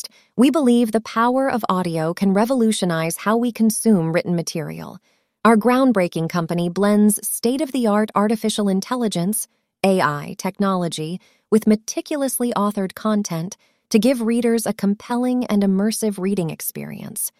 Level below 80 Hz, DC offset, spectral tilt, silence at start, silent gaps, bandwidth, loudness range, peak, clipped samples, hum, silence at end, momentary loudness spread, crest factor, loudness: -62 dBFS; under 0.1%; -5.5 dB/octave; 0.05 s; none; 16 kHz; 3 LU; -2 dBFS; under 0.1%; none; 0.1 s; 10 LU; 18 dB; -20 LUFS